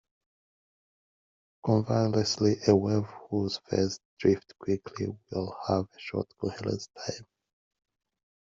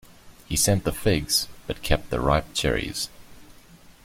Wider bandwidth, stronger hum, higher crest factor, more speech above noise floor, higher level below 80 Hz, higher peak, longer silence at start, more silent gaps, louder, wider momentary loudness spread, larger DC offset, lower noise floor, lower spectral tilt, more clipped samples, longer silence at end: second, 7.6 kHz vs 16.5 kHz; neither; about the same, 22 dB vs 20 dB; first, over 61 dB vs 26 dB; second, -64 dBFS vs -36 dBFS; about the same, -8 dBFS vs -6 dBFS; first, 1.65 s vs 0.25 s; first, 4.05-4.17 s vs none; second, -30 LUFS vs -24 LUFS; about the same, 11 LU vs 10 LU; neither; first, under -90 dBFS vs -50 dBFS; first, -6 dB/octave vs -3.5 dB/octave; neither; first, 1.2 s vs 0.55 s